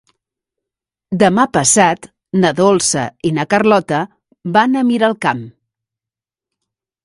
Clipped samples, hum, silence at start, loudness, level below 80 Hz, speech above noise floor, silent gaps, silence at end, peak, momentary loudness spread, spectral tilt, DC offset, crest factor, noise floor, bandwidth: under 0.1%; none; 1.1 s; -14 LUFS; -54 dBFS; 74 dB; none; 1.55 s; 0 dBFS; 12 LU; -4 dB/octave; under 0.1%; 16 dB; -88 dBFS; 11.5 kHz